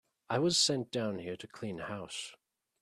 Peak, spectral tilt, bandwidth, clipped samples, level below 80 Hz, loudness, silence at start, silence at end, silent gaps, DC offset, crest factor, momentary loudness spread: -16 dBFS; -3.5 dB/octave; 13.5 kHz; under 0.1%; -72 dBFS; -33 LUFS; 0.3 s; 0.45 s; none; under 0.1%; 20 dB; 15 LU